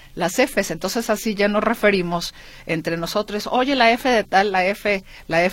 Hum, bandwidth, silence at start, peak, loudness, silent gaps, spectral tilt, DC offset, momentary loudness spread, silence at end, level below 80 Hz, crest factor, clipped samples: none; 16.5 kHz; 0.05 s; 0 dBFS; -20 LUFS; none; -4 dB/octave; under 0.1%; 9 LU; 0 s; -46 dBFS; 20 dB; under 0.1%